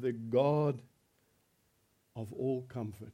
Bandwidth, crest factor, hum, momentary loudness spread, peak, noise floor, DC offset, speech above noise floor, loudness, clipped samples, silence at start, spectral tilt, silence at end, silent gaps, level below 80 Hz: 14.5 kHz; 20 dB; none; 16 LU; -16 dBFS; -74 dBFS; under 0.1%; 40 dB; -34 LUFS; under 0.1%; 0 s; -9 dB/octave; 0 s; none; -74 dBFS